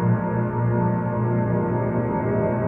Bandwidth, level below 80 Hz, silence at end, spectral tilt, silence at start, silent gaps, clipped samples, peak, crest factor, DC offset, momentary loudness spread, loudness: 2.9 kHz; -44 dBFS; 0 s; -12.5 dB/octave; 0 s; none; under 0.1%; -10 dBFS; 12 dB; under 0.1%; 2 LU; -23 LUFS